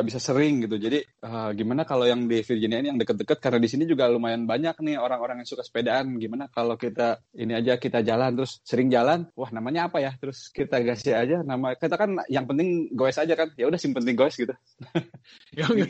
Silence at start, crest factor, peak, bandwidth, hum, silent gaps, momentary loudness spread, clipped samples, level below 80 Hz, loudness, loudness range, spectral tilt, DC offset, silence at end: 0 s; 18 dB; -8 dBFS; 8.6 kHz; none; none; 9 LU; under 0.1%; -64 dBFS; -25 LUFS; 2 LU; -6 dB/octave; under 0.1%; 0 s